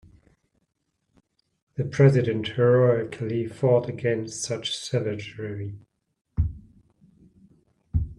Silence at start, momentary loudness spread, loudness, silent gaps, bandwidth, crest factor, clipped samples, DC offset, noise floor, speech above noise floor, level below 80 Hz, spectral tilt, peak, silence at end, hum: 1.8 s; 15 LU; -25 LUFS; 6.21-6.25 s; 11 kHz; 22 dB; under 0.1%; under 0.1%; -76 dBFS; 52 dB; -42 dBFS; -6 dB/octave; -4 dBFS; 0.05 s; none